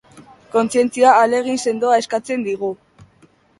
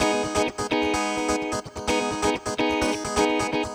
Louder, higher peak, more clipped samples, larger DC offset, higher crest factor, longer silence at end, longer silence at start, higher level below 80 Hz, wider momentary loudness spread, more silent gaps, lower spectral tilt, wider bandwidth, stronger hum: first, -17 LUFS vs -24 LUFS; first, 0 dBFS vs -10 dBFS; neither; neither; about the same, 18 dB vs 16 dB; first, 0.85 s vs 0 s; first, 0.15 s vs 0 s; second, -62 dBFS vs -44 dBFS; first, 12 LU vs 3 LU; neither; about the same, -4 dB/octave vs -3.5 dB/octave; second, 11.5 kHz vs over 20 kHz; neither